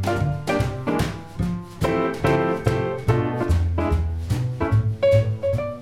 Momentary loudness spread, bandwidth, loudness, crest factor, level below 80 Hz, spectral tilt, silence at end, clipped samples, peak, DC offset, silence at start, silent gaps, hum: 6 LU; 15 kHz; -23 LUFS; 18 dB; -34 dBFS; -7.5 dB/octave; 0 s; under 0.1%; -4 dBFS; 0.3%; 0 s; none; none